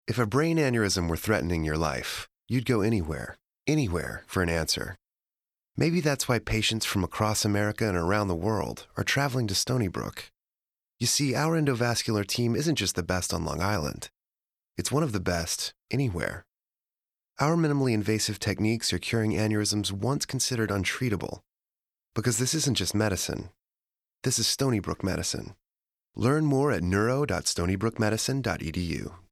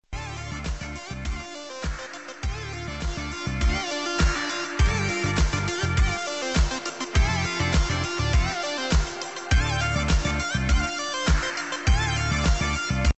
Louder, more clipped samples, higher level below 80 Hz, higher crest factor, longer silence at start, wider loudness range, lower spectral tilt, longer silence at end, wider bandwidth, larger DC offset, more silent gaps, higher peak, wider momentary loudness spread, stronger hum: about the same, -27 LUFS vs -26 LUFS; neither; second, -48 dBFS vs -28 dBFS; about the same, 18 dB vs 16 dB; about the same, 0.05 s vs 0.1 s; second, 3 LU vs 6 LU; about the same, -4.5 dB/octave vs -4 dB/octave; about the same, 0.15 s vs 0.05 s; first, 16 kHz vs 8.4 kHz; second, under 0.1% vs 0.2%; neither; about the same, -10 dBFS vs -8 dBFS; about the same, 10 LU vs 10 LU; neither